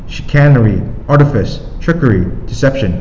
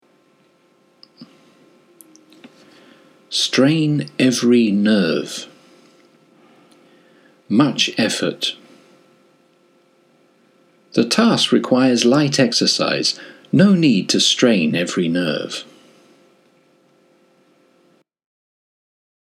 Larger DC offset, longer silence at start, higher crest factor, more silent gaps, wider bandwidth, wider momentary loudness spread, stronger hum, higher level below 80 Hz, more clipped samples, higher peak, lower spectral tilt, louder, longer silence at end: neither; second, 0 s vs 1.2 s; second, 10 dB vs 20 dB; neither; second, 7.6 kHz vs 15 kHz; about the same, 11 LU vs 10 LU; neither; first, -24 dBFS vs -70 dBFS; neither; about the same, 0 dBFS vs 0 dBFS; first, -8 dB/octave vs -4.5 dB/octave; first, -12 LUFS vs -16 LUFS; second, 0 s vs 3.65 s